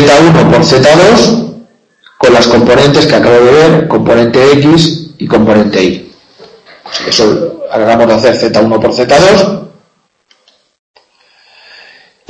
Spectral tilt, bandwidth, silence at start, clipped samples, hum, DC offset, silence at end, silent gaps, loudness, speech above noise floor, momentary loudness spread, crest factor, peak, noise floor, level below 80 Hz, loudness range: -5.5 dB/octave; 11 kHz; 0 s; 3%; none; under 0.1%; 2.6 s; none; -6 LUFS; 48 dB; 10 LU; 8 dB; 0 dBFS; -54 dBFS; -38 dBFS; 5 LU